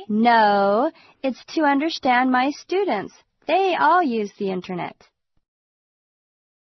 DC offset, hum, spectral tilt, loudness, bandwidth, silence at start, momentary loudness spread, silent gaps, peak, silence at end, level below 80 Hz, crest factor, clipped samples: under 0.1%; none; -5.5 dB/octave; -20 LUFS; 6.2 kHz; 0 s; 13 LU; none; -6 dBFS; 1.85 s; -68 dBFS; 16 dB; under 0.1%